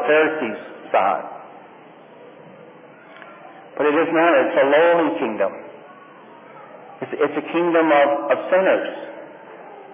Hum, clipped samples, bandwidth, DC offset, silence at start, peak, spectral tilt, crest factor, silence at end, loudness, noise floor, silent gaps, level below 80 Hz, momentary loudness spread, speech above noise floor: none; under 0.1%; 3.7 kHz; under 0.1%; 0 s; -4 dBFS; -8.5 dB/octave; 16 dB; 0 s; -18 LUFS; -44 dBFS; none; -80 dBFS; 24 LU; 26 dB